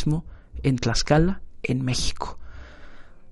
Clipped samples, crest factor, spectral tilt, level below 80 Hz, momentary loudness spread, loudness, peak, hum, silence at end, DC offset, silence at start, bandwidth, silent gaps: under 0.1%; 20 dB; -5 dB/octave; -34 dBFS; 23 LU; -25 LUFS; -4 dBFS; none; 0 s; under 0.1%; 0 s; 11.5 kHz; none